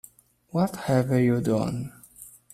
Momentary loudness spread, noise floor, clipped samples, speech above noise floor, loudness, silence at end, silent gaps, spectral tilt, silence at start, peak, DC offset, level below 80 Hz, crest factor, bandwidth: 23 LU; -54 dBFS; under 0.1%; 30 dB; -25 LUFS; 0.25 s; none; -7.5 dB/octave; 0.55 s; -10 dBFS; under 0.1%; -58 dBFS; 18 dB; 15 kHz